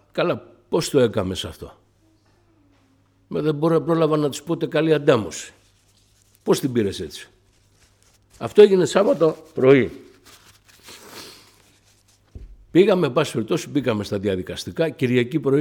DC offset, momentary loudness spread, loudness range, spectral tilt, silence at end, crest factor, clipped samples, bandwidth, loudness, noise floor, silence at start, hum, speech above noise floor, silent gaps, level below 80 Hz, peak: under 0.1%; 18 LU; 7 LU; -6 dB/octave; 0 s; 20 dB; under 0.1%; 17.5 kHz; -20 LUFS; -60 dBFS; 0.15 s; none; 40 dB; none; -54 dBFS; -2 dBFS